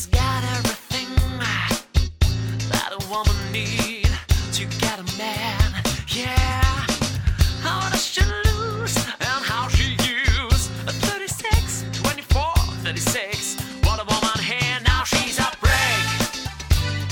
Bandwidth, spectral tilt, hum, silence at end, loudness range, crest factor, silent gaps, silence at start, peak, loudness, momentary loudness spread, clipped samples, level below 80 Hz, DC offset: 18 kHz; -3.5 dB/octave; none; 0 s; 3 LU; 16 dB; none; 0 s; -4 dBFS; -22 LUFS; 5 LU; under 0.1%; -26 dBFS; under 0.1%